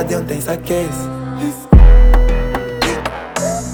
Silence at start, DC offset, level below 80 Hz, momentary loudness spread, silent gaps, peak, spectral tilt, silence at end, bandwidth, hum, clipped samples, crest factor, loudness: 0 s; under 0.1%; -14 dBFS; 12 LU; none; 0 dBFS; -6 dB/octave; 0 s; 19.5 kHz; none; under 0.1%; 12 dB; -16 LUFS